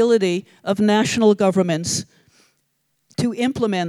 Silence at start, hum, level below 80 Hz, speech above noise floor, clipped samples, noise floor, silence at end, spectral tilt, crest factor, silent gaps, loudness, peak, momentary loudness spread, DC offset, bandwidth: 0 s; none; -58 dBFS; 51 dB; under 0.1%; -70 dBFS; 0 s; -5 dB/octave; 16 dB; none; -19 LUFS; -2 dBFS; 9 LU; under 0.1%; 13.5 kHz